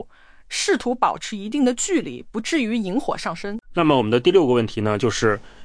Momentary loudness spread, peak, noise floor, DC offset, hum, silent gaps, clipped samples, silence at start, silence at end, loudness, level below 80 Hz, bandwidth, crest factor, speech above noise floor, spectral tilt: 11 LU; -4 dBFS; -45 dBFS; under 0.1%; none; none; under 0.1%; 0 s; 0 s; -21 LUFS; -48 dBFS; 10.5 kHz; 16 dB; 24 dB; -4.5 dB/octave